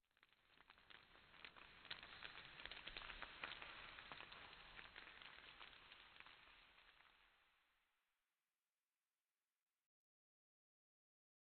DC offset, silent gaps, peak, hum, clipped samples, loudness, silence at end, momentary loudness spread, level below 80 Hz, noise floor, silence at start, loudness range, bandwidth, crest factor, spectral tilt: under 0.1%; none; -32 dBFS; none; under 0.1%; -58 LUFS; 3.7 s; 12 LU; -78 dBFS; under -90 dBFS; 0.2 s; 10 LU; 4.5 kHz; 32 dB; 0.5 dB/octave